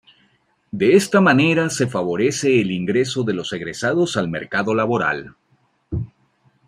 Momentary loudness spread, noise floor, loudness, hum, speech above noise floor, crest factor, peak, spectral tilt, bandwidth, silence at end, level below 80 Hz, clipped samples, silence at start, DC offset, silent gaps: 15 LU; -62 dBFS; -19 LUFS; none; 44 dB; 18 dB; -2 dBFS; -5 dB/octave; 14.5 kHz; 0.6 s; -52 dBFS; under 0.1%; 0.75 s; under 0.1%; none